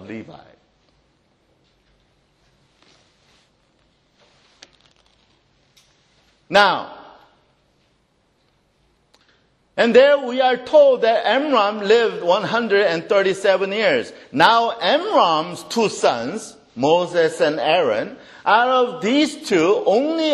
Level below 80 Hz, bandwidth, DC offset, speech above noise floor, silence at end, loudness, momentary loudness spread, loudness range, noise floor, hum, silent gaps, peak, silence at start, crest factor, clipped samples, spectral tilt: -66 dBFS; 12 kHz; under 0.1%; 46 dB; 0 s; -17 LUFS; 11 LU; 7 LU; -63 dBFS; none; none; 0 dBFS; 0 s; 20 dB; under 0.1%; -4 dB/octave